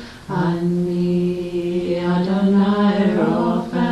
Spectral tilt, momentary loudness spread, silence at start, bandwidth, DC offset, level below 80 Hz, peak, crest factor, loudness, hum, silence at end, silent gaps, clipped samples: -8.5 dB/octave; 6 LU; 0 s; 9.6 kHz; under 0.1%; -48 dBFS; -6 dBFS; 12 dB; -19 LUFS; none; 0 s; none; under 0.1%